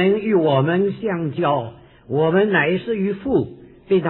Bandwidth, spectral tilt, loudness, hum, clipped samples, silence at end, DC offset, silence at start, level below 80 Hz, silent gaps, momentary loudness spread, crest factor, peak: 4.2 kHz; -11 dB/octave; -19 LUFS; none; under 0.1%; 0 s; under 0.1%; 0 s; -52 dBFS; none; 7 LU; 16 dB; -4 dBFS